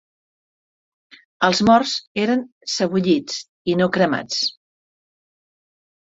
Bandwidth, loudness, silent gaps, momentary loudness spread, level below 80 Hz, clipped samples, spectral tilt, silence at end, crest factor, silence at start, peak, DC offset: 8 kHz; -20 LUFS; 2.07-2.15 s, 2.52-2.61 s, 3.48-3.65 s; 9 LU; -60 dBFS; under 0.1%; -4.5 dB/octave; 1.65 s; 20 dB; 1.4 s; -2 dBFS; under 0.1%